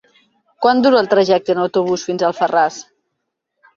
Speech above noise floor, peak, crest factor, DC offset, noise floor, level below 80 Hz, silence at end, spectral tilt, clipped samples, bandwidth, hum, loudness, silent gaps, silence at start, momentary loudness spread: 60 dB; -2 dBFS; 16 dB; under 0.1%; -75 dBFS; -62 dBFS; 0.95 s; -5 dB/octave; under 0.1%; 7.6 kHz; none; -15 LUFS; none; 0.6 s; 7 LU